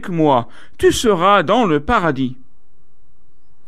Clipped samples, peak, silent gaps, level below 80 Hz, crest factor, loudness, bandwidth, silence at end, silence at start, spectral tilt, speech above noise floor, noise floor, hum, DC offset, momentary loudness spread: under 0.1%; -2 dBFS; none; -40 dBFS; 16 dB; -15 LUFS; 14.5 kHz; 1.35 s; 0.05 s; -5 dB/octave; 42 dB; -57 dBFS; none; 4%; 10 LU